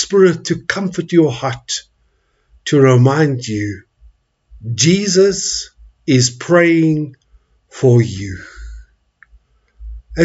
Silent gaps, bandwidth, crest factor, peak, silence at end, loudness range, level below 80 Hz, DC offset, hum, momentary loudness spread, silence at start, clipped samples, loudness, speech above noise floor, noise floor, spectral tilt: none; 8 kHz; 16 dB; 0 dBFS; 0 s; 2 LU; -42 dBFS; under 0.1%; none; 17 LU; 0 s; under 0.1%; -14 LUFS; 47 dB; -60 dBFS; -5 dB/octave